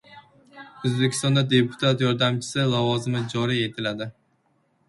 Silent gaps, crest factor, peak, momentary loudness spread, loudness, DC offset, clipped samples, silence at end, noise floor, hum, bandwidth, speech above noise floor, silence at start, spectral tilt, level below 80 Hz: none; 18 dB; -6 dBFS; 9 LU; -23 LUFS; under 0.1%; under 0.1%; 0.75 s; -67 dBFS; none; 11.5 kHz; 44 dB; 0.1 s; -5.5 dB/octave; -60 dBFS